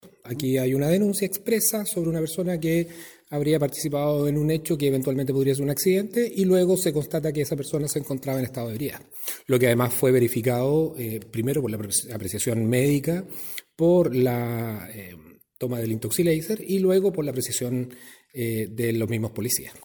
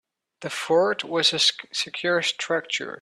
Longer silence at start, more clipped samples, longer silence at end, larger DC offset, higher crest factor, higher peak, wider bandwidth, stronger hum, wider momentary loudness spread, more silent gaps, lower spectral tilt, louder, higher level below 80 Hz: second, 0.05 s vs 0.4 s; neither; about the same, 0.05 s vs 0.05 s; neither; about the same, 18 dB vs 18 dB; about the same, -8 dBFS vs -6 dBFS; first, 19.5 kHz vs 13 kHz; neither; about the same, 11 LU vs 11 LU; neither; first, -5.5 dB/octave vs -2 dB/octave; about the same, -24 LUFS vs -23 LUFS; first, -58 dBFS vs -72 dBFS